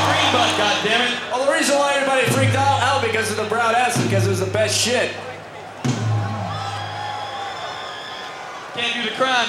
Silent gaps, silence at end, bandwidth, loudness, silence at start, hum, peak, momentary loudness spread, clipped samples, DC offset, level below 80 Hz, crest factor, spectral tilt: none; 0 s; 15 kHz; -19 LUFS; 0 s; none; -4 dBFS; 13 LU; under 0.1%; under 0.1%; -60 dBFS; 16 dB; -3.5 dB/octave